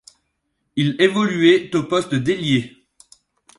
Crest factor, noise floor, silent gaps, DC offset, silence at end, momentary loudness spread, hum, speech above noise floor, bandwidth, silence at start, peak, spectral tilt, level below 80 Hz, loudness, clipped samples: 18 dB; -72 dBFS; none; under 0.1%; 0.9 s; 7 LU; none; 55 dB; 11.5 kHz; 0.75 s; -2 dBFS; -6 dB/octave; -58 dBFS; -18 LUFS; under 0.1%